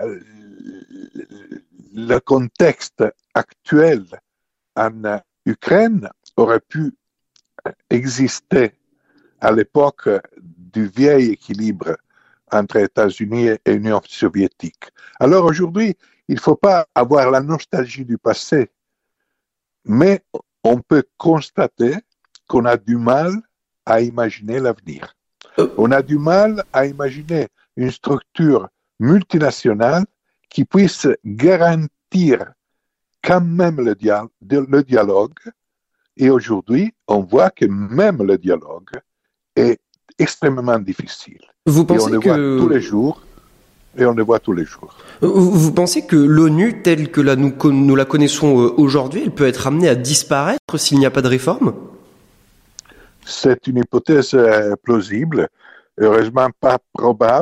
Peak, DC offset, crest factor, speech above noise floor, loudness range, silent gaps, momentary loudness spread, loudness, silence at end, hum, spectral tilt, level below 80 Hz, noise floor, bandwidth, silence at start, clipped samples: 0 dBFS; under 0.1%; 16 dB; 64 dB; 5 LU; 50.59-50.68 s; 12 LU; -16 LUFS; 0 s; none; -6 dB/octave; -54 dBFS; -79 dBFS; 14.5 kHz; 0 s; under 0.1%